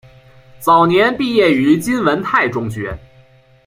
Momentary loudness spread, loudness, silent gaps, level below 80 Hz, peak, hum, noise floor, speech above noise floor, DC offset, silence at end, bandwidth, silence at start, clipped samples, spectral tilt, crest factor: 13 LU; -14 LUFS; none; -46 dBFS; -2 dBFS; none; -48 dBFS; 34 dB; under 0.1%; 0.7 s; 16 kHz; 0.6 s; under 0.1%; -5.5 dB/octave; 14 dB